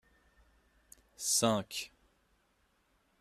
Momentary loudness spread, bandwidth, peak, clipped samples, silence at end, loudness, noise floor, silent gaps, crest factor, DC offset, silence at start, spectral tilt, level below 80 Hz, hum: 14 LU; 14 kHz; -14 dBFS; under 0.1%; 1.35 s; -32 LUFS; -74 dBFS; none; 26 dB; under 0.1%; 1.2 s; -2.5 dB/octave; -70 dBFS; none